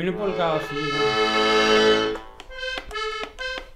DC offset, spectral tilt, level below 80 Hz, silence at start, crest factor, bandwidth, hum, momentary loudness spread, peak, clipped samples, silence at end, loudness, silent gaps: under 0.1%; -4 dB/octave; -46 dBFS; 0 s; 16 dB; 13 kHz; none; 13 LU; -6 dBFS; under 0.1%; 0 s; -22 LUFS; none